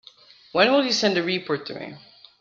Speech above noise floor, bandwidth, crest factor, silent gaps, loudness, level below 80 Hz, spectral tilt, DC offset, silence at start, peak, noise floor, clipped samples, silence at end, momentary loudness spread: 29 dB; 7.6 kHz; 20 dB; none; -22 LUFS; -68 dBFS; -3.5 dB/octave; under 0.1%; 0.55 s; -4 dBFS; -51 dBFS; under 0.1%; 0.4 s; 17 LU